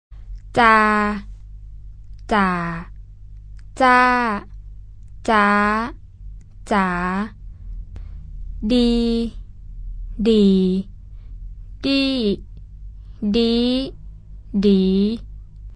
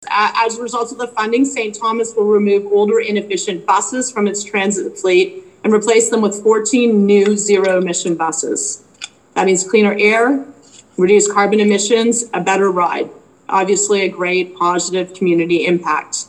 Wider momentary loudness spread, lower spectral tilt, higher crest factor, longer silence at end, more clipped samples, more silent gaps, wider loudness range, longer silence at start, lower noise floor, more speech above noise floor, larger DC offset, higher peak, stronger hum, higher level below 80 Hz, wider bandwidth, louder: first, 25 LU vs 8 LU; first, -6.5 dB/octave vs -3.5 dB/octave; first, 20 dB vs 14 dB; about the same, 0 s vs 0.05 s; neither; neither; about the same, 4 LU vs 3 LU; about the same, 0.1 s vs 0 s; about the same, -38 dBFS vs -36 dBFS; about the same, 21 dB vs 21 dB; neither; about the same, 0 dBFS vs 0 dBFS; first, 50 Hz at -50 dBFS vs none; first, -36 dBFS vs -66 dBFS; second, 10 kHz vs 11.5 kHz; second, -19 LUFS vs -15 LUFS